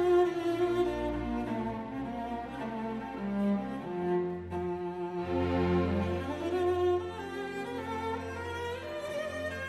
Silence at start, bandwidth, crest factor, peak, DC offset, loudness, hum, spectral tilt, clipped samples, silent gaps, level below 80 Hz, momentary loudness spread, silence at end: 0 s; 12.5 kHz; 14 dB; -18 dBFS; under 0.1%; -33 LUFS; none; -7 dB/octave; under 0.1%; none; -52 dBFS; 9 LU; 0 s